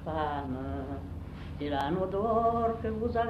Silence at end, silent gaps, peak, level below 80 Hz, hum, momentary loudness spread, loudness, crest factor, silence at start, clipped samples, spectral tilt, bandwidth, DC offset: 0 s; none; -16 dBFS; -46 dBFS; 50 Hz at -45 dBFS; 13 LU; -32 LUFS; 16 dB; 0 s; under 0.1%; -8.5 dB/octave; 13 kHz; under 0.1%